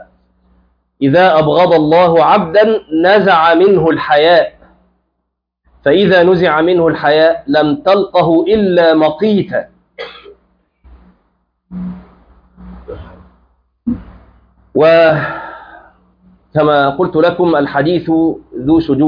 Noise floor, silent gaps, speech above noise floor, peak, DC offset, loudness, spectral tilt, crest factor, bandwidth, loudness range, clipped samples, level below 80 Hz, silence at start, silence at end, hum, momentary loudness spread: -71 dBFS; none; 62 dB; 0 dBFS; under 0.1%; -11 LUFS; -8.5 dB/octave; 12 dB; 5.2 kHz; 19 LU; under 0.1%; -44 dBFS; 0 s; 0 s; none; 17 LU